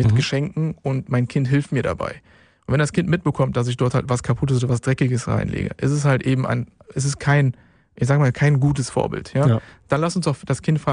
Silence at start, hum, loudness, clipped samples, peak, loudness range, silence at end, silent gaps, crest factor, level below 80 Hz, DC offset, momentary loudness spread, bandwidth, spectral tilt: 0 s; none; -21 LUFS; under 0.1%; -4 dBFS; 2 LU; 0 s; none; 16 dB; -46 dBFS; under 0.1%; 7 LU; 10.5 kHz; -6.5 dB/octave